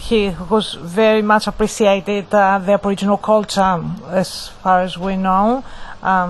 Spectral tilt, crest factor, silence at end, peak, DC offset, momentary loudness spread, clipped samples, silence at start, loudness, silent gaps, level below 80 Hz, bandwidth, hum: -5 dB/octave; 16 dB; 0 s; 0 dBFS; under 0.1%; 8 LU; under 0.1%; 0 s; -16 LUFS; none; -38 dBFS; 12.5 kHz; none